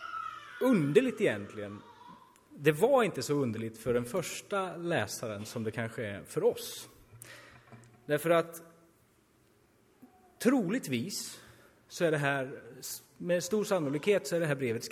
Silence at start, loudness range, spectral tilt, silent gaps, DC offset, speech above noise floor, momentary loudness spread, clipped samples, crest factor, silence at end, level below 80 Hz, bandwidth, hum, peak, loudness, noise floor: 0 s; 6 LU; -5 dB/octave; none; under 0.1%; 36 dB; 17 LU; under 0.1%; 22 dB; 0 s; -68 dBFS; 16 kHz; none; -10 dBFS; -32 LUFS; -67 dBFS